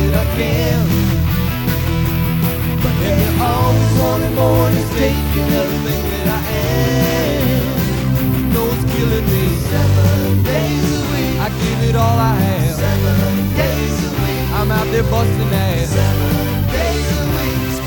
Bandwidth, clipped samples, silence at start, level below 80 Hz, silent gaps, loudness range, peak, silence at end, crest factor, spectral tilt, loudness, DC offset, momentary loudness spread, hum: 19 kHz; under 0.1%; 0 s; -24 dBFS; none; 1 LU; -2 dBFS; 0 s; 12 dB; -6 dB/octave; -16 LUFS; under 0.1%; 4 LU; none